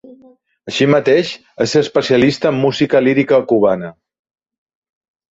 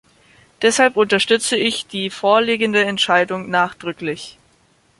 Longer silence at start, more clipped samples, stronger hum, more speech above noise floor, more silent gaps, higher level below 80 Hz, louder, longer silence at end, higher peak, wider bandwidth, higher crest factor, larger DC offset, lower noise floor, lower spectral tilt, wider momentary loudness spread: about the same, 0.65 s vs 0.6 s; neither; neither; second, 35 dB vs 40 dB; neither; first, -54 dBFS vs -60 dBFS; first, -14 LUFS vs -17 LUFS; first, 1.4 s vs 0.7 s; about the same, -2 dBFS vs -2 dBFS; second, 8 kHz vs 11.5 kHz; about the same, 14 dB vs 18 dB; neither; second, -48 dBFS vs -57 dBFS; first, -5.5 dB/octave vs -3 dB/octave; second, 9 LU vs 12 LU